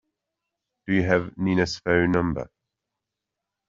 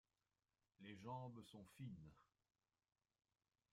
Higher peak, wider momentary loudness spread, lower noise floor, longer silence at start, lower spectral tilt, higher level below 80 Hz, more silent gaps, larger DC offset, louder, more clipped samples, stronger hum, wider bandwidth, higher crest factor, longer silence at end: first, -4 dBFS vs -42 dBFS; first, 13 LU vs 10 LU; second, -85 dBFS vs under -90 dBFS; about the same, 0.85 s vs 0.8 s; about the same, -5.5 dB/octave vs -6.5 dB/octave; first, -52 dBFS vs -86 dBFS; neither; neither; first, -24 LUFS vs -58 LUFS; neither; neither; second, 7.6 kHz vs 14.5 kHz; about the same, 22 dB vs 20 dB; second, 1.25 s vs 1.5 s